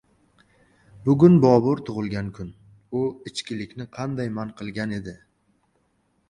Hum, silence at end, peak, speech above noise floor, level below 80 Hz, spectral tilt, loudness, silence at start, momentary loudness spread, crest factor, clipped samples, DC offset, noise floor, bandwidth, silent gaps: none; 1.15 s; -2 dBFS; 46 dB; -54 dBFS; -8 dB/octave; -23 LUFS; 1 s; 19 LU; 22 dB; under 0.1%; under 0.1%; -68 dBFS; 10.5 kHz; none